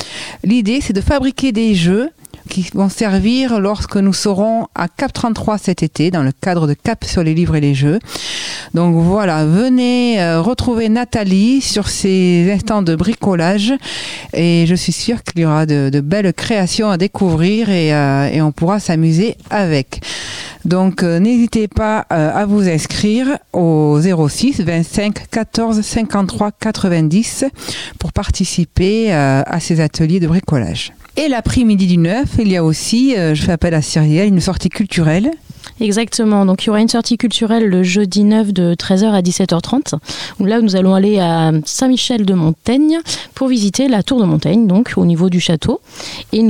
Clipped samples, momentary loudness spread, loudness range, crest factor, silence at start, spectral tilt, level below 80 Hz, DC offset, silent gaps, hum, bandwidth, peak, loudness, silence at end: under 0.1%; 7 LU; 2 LU; 14 dB; 0 s; -6 dB/octave; -34 dBFS; 0.6%; none; none; 15.5 kHz; 0 dBFS; -14 LUFS; 0 s